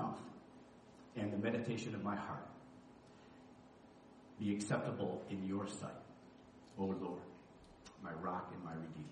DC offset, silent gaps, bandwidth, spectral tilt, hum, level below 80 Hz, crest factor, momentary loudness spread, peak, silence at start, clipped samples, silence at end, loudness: under 0.1%; none; 10 kHz; -6 dB/octave; none; -76 dBFS; 22 dB; 22 LU; -22 dBFS; 0 s; under 0.1%; 0 s; -43 LUFS